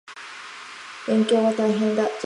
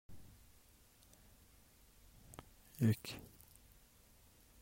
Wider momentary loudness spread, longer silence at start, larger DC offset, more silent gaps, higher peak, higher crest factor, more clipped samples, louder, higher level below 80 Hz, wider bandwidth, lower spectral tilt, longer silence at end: second, 17 LU vs 29 LU; about the same, 0.1 s vs 0.1 s; neither; neither; first, -10 dBFS vs -22 dBFS; second, 14 dB vs 24 dB; neither; first, -21 LUFS vs -39 LUFS; second, -74 dBFS vs -68 dBFS; second, 10.5 kHz vs 16 kHz; about the same, -5.5 dB/octave vs -6.5 dB/octave; second, 0 s vs 1.35 s